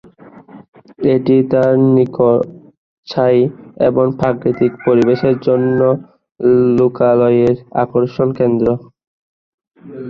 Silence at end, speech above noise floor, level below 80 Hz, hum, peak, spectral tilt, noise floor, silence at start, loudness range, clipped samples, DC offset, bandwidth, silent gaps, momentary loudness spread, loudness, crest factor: 0 s; 27 dB; -50 dBFS; none; -2 dBFS; -9.5 dB/octave; -40 dBFS; 0.55 s; 2 LU; under 0.1%; under 0.1%; 6.4 kHz; 0.68-0.73 s, 2.77-3.03 s, 9.07-9.58 s; 6 LU; -14 LUFS; 12 dB